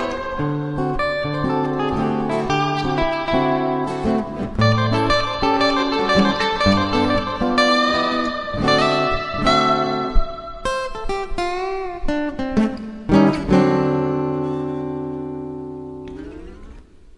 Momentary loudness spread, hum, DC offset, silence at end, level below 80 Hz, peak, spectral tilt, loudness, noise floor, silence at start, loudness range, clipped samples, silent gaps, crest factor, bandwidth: 11 LU; none; under 0.1%; 0.05 s; -34 dBFS; -2 dBFS; -6 dB/octave; -20 LUFS; -41 dBFS; 0 s; 5 LU; under 0.1%; none; 18 dB; 11 kHz